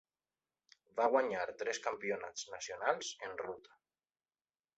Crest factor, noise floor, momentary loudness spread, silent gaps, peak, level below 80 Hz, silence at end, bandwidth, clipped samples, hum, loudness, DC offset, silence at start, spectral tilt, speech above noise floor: 24 dB; under -90 dBFS; 12 LU; none; -16 dBFS; -80 dBFS; 1.15 s; 8 kHz; under 0.1%; none; -38 LUFS; under 0.1%; 0.95 s; -1 dB/octave; over 52 dB